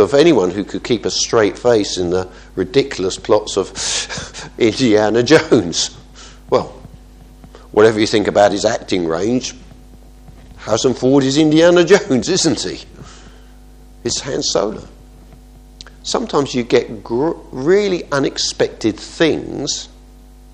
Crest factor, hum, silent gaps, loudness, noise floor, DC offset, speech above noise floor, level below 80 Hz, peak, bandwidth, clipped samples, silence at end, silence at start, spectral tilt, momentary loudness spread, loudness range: 16 dB; none; none; -16 LUFS; -41 dBFS; under 0.1%; 25 dB; -42 dBFS; 0 dBFS; 10.5 kHz; under 0.1%; 0.65 s; 0 s; -4 dB/octave; 12 LU; 6 LU